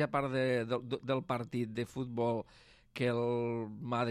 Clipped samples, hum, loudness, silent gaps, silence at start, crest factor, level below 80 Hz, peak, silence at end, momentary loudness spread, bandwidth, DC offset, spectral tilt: under 0.1%; none; -35 LUFS; none; 0 s; 16 dB; -68 dBFS; -20 dBFS; 0 s; 7 LU; 13 kHz; under 0.1%; -7 dB/octave